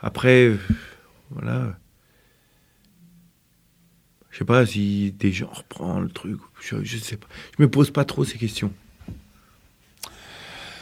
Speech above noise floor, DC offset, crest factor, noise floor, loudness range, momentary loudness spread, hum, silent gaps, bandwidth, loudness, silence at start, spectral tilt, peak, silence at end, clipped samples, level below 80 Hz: 40 dB; under 0.1%; 24 dB; -62 dBFS; 9 LU; 24 LU; none; none; 15.5 kHz; -23 LUFS; 0 s; -6.5 dB/octave; 0 dBFS; 0 s; under 0.1%; -48 dBFS